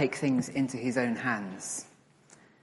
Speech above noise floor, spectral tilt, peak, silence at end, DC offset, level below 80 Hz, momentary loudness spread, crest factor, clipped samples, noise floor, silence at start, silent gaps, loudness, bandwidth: 29 dB; -5 dB/octave; -14 dBFS; 0.75 s; under 0.1%; -74 dBFS; 8 LU; 18 dB; under 0.1%; -59 dBFS; 0 s; none; -31 LUFS; 11.5 kHz